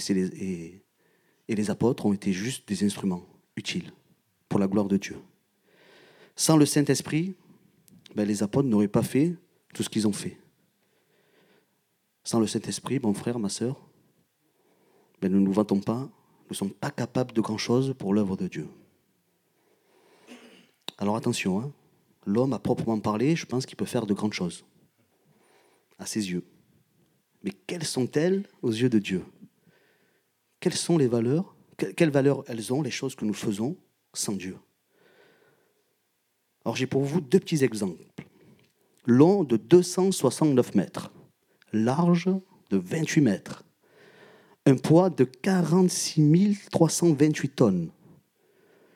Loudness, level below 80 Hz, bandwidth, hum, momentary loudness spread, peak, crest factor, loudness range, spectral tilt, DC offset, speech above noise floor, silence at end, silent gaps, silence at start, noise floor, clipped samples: -26 LUFS; -70 dBFS; 16 kHz; none; 16 LU; -4 dBFS; 22 dB; 10 LU; -6 dB/octave; under 0.1%; 49 dB; 1.05 s; none; 0 s; -74 dBFS; under 0.1%